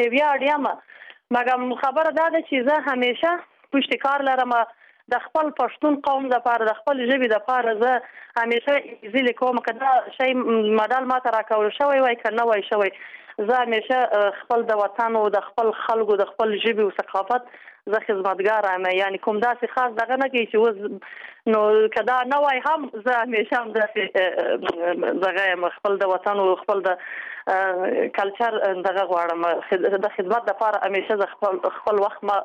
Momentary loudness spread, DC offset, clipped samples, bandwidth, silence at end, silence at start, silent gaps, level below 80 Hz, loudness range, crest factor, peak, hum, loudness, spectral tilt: 5 LU; under 0.1%; under 0.1%; 8 kHz; 0 s; 0 s; none; -72 dBFS; 2 LU; 14 dB; -8 dBFS; none; -22 LUFS; -5.5 dB/octave